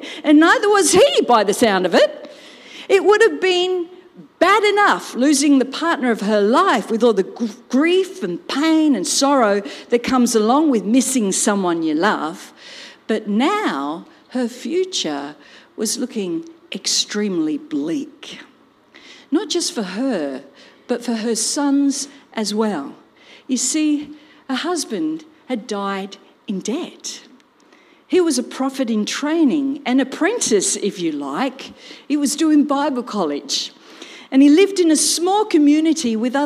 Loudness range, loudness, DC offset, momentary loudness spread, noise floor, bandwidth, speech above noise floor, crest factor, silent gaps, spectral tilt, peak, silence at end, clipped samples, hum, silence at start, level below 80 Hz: 8 LU; -18 LUFS; under 0.1%; 15 LU; -51 dBFS; 15.5 kHz; 34 dB; 16 dB; none; -3 dB/octave; -2 dBFS; 0 s; under 0.1%; none; 0 s; -66 dBFS